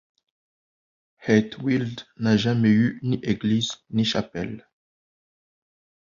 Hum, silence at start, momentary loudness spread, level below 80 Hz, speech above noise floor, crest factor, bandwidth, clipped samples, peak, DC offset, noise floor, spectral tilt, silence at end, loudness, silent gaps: none; 1.2 s; 13 LU; -56 dBFS; over 67 dB; 20 dB; 7.4 kHz; under 0.1%; -4 dBFS; under 0.1%; under -90 dBFS; -6 dB/octave; 1.5 s; -23 LUFS; none